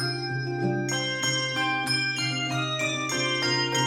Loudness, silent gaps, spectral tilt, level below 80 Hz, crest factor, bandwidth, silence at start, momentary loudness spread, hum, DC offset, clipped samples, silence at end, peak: -26 LUFS; none; -3 dB/octave; -64 dBFS; 14 dB; 16 kHz; 0 s; 4 LU; none; under 0.1%; under 0.1%; 0 s; -12 dBFS